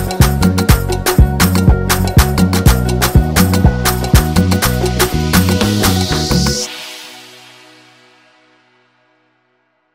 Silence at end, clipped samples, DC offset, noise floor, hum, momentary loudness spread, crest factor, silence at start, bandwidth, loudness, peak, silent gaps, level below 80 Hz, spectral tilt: 2.7 s; under 0.1%; under 0.1%; -61 dBFS; none; 4 LU; 14 dB; 0 s; 16.5 kHz; -12 LUFS; 0 dBFS; none; -20 dBFS; -5 dB/octave